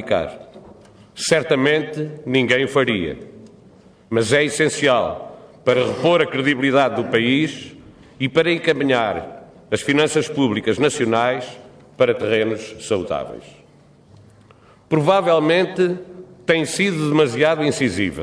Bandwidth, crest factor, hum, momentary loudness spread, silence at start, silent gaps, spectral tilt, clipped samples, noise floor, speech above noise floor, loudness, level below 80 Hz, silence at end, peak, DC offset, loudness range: 11 kHz; 16 dB; none; 12 LU; 0 s; none; -5 dB/octave; under 0.1%; -50 dBFS; 31 dB; -19 LUFS; -54 dBFS; 0 s; -2 dBFS; under 0.1%; 4 LU